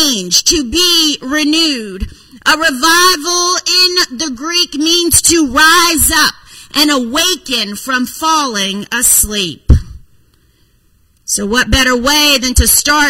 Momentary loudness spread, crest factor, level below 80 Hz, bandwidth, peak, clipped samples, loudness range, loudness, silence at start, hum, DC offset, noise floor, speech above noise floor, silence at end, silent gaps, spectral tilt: 9 LU; 12 dB; -24 dBFS; over 20 kHz; 0 dBFS; 0.3%; 4 LU; -10 LUFS; 0 s; none; under 0.1%; -52 dBFS; 40 dB; 0 s; none; -2 dB/octave